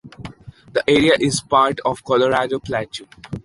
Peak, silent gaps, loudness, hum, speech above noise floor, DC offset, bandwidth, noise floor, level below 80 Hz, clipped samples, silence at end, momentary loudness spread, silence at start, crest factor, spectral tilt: -2 dBFS; none; -18 LUFS; none; 20 dB; under 0.1%; 11.5 kHz; -38 dBFS; -48 dBFS; under 0.1%; 0.05 s; 19 LU; 0.05 s; 18 dB; -4.5 dB/octave